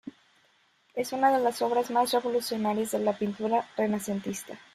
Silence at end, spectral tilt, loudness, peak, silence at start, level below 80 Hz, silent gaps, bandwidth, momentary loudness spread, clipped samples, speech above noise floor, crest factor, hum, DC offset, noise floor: 0.15 s; -4.5 dB/octave; -28 LUFS; -12 dBFS; 0.05 s; -72 dBFS; none; 15.5 kHz; 10 LU; under 0.1%; 38 dB; 16 dB; none; under 0.1%; -66 dBFS